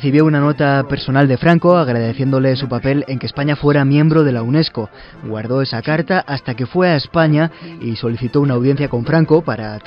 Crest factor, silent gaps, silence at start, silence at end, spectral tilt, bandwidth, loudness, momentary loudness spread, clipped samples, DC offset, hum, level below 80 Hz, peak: 14 dB; none; 0 s; 0.05 s; -9.5 dB/octave; 5.6 kHz; -15 LUFS; 10 LU; under 0.1%; under 0.1%; none; -44 dBFS; 0 dBFS